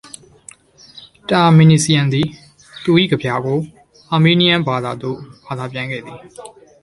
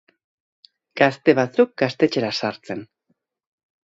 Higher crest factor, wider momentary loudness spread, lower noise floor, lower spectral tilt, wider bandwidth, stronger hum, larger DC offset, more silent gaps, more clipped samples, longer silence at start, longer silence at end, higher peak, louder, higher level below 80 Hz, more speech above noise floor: second, 16 dB vs 22 dB; first, 21 LU vs 15 LU; second, -44 dBFS vs -71 dBFS; about the same, -5.5 dB/octave vs -6 dB/octave; first, 11.5 kHz vs 7.8 kHz; neither; neither; neither; neither; about the same, 0.95 s vs 0.95 s; second, 0.35 s vs 1.05 s; about the same, 0 dBFS vs 0 dBFS; first, -15 LUFS vs -20 LUFS; first, -52 dBFS vs -68 dBFS; second, 29 dB vs 51 dB